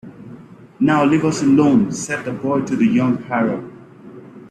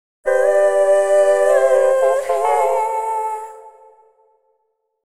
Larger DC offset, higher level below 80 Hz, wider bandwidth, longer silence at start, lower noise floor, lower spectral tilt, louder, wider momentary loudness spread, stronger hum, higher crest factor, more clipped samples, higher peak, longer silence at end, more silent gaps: neither; first, -56 dBFS vs -64 dBFS; second, 11 kHz vs 13.5 kHz; second, 0.05 s vs 0.25 s; second, -40 dBFS vs -69 dBFS; first, -6 dB/octave vs -2 dB/octave; about the same, -17 LUFS vs -16 LUFS; about the same, 10 LU vs 9 LU; neither; about the same, 16 dB vs 14 dB; neither; about the same, -4 dBFS vs -2 dBFS; second, 0.05 s vs 1.35 s; neither